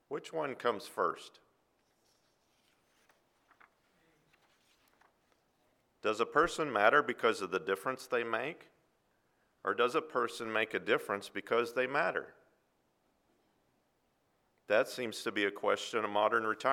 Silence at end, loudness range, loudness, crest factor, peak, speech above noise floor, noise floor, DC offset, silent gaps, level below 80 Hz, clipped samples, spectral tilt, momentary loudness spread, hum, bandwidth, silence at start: 0 s; 8 LU; -33 LUFS; 26 dB; -10 dBFS; 43 dB; -76 dBFS; under 0.1%; none; -72 dBFS; under 0.1%; -3.5 dB/octave; 9 LU; none; 16.5 kHz; 0.1 s